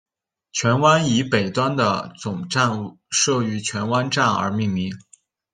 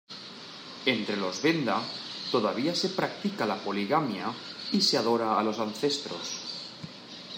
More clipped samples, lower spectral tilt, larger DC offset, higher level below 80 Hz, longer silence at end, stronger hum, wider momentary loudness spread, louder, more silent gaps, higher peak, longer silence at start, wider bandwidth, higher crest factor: neither; about the same, -4 dB/octave vs -4 dB/octave; neither; first, -60 dBFS vs -78 dBFS; first, 0.5 s vs 0 s; neither; second, 12 LU vs 15 LU; first, -21 LUFS vs -29 LUFS; neither; first, -2 dBFS vs -10 dBFS; first, 0.55 s vs 0.1 s; second, 10.5 kHz vs 16 kHz; about the same, 18 dB vs 18 dB